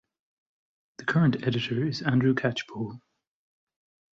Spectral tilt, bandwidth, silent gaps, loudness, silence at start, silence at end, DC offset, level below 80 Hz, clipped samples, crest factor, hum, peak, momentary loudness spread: -7 dB/octave; 7.6 kHz; none; -27 LUFS; 1 s; 1.15 s; under 0.1%; -64 dBFS; under 0.1%; 18 dB; none; -12 dBFS; 12 LU